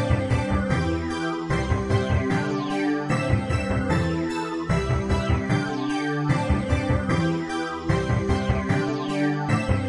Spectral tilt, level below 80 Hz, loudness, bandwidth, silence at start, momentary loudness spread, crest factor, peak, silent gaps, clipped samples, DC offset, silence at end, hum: -7 dB/octave; -36 dBFS; -24 LUFS; 11.5 kHz; 0 s; 3 LU; 16 dB; -8 dBFS; none; under 0.1%; under 0.1%; 0 s; none